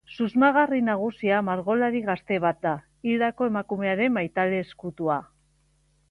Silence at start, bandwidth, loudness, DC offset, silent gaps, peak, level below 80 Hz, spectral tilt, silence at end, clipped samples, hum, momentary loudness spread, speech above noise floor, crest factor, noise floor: 0.1 s; 5.8 kHz; -25 LUFS; under 0.1%; none; -8 dBFS; -64 dBFS; -8 dB/octave; 0.85 s; under 0.1%; none; 9 LU; 41 dB; 18 dB; -65 dBFS